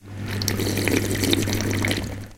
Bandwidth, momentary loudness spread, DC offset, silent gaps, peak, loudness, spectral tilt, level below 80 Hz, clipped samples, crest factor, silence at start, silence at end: 17 kHz; 5 LU; under 0.1%; none; 0 dBFS; -23 LUFS; -4 dB/octave; -40 dBFS; under 0.1%; 24 dB; 0.05 s; 0 s